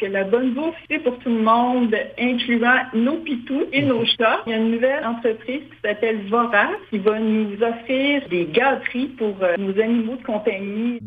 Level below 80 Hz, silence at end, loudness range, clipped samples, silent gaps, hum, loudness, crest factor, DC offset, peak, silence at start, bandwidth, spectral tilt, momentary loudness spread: -60 dBFS; 0 s; 2 LU; under 0.1%; none; none; -20 LUFS; 18 dB; under 0.1%; -2 dBFS; 0 s; 5 kHz; -8 dB/octave; 7 LU